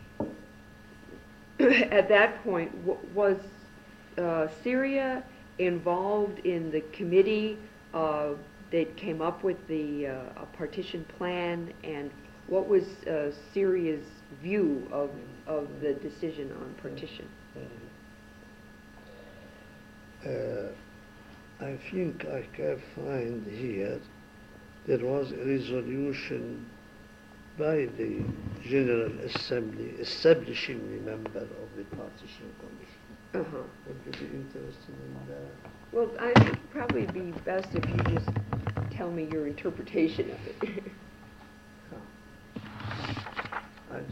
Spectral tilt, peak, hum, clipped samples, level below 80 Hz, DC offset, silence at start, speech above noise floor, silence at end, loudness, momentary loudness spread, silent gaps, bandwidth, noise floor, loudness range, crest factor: -7 dB/octave; -6 dBFS; none; under 0.1%; -56 dBFS; under 0.1%; 0 s; 21 dB; 0 s; -30 LUFS; 24 LU; none; 15 kHz; -51 dBFS; 13 LU; 26 dB